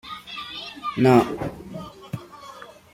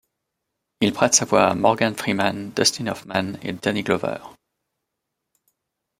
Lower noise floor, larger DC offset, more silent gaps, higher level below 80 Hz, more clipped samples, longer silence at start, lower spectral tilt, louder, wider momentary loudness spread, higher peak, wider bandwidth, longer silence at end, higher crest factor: second, -43 dBFS vs -81 dBFS; neither; neither; first, -54 dBFS vs -62 dBFS; neither; second, 0.05 s vs 0.8 s; first, -7 dB/octave vs -3 dB/octave; about the same, -23 LUFS vs -21 LUFS; first, 24 LU vs 11 LU; about the same, -4 dBFS vs -2 dBFS; about the same, 16.5 kHz vs 16 kHz; second, 0.2 s vs 1.65 s; about the same, 22 dB vs 22 dB